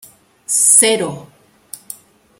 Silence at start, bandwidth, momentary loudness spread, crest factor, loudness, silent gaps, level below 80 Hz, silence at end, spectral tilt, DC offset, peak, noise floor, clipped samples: 0.5 s; over 20 kHz; 26 LU; 18 dB; -11 LUFS; none; -64 dBFS; 0.65 s; -1 dB/octave; under 0.1%; 0 dBFS; -39 dBFS; under 0.1%